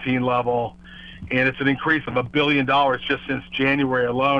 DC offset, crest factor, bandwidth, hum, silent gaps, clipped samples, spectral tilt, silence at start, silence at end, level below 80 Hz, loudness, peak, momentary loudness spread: under 0.1%; 16 dB; 6.8 kHz; none; none; under 0.1%; -7.5 dB/octave; 0 s; 0 s; -50 dBFS; -21 LUFS; -6 dBFS; 9 LU